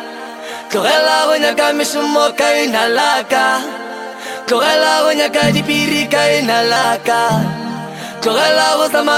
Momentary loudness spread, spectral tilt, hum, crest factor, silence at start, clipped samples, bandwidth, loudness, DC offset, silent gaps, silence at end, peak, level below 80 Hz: 14 LU; -3 dB/octave; none; 14 dB; 0 s; under 0.1%; 17 kHz; -13 LUFS; under 0.1%; none; 0 s; 0 dBFS; -56 dBFS